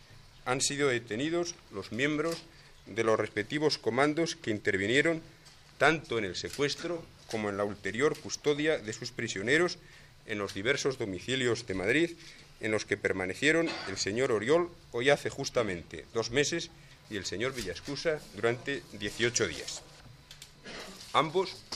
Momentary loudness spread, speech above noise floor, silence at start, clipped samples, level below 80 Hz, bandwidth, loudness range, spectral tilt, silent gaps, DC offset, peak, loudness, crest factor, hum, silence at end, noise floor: 12 LU; 21 dB; 0.1 s; under 0.1%; -60 dBFS; 14 kHz; 4 LU; -3.5 dB/octave; none; under 0.1%; -8 dBFS; -31 LUFS; 22 dB; none; 0 s; -52 dBFS